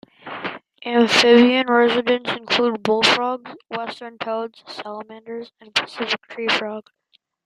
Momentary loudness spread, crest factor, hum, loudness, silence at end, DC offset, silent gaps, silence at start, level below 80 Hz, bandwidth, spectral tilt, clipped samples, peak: 20 LU; 20 dB; none; -18 LUFS; 0.65 s; under 0.1%; none; 0.25 s; -66 dBFS; 12 kHz; -3.5 dB/octave; under 0.1%; 0 dBFS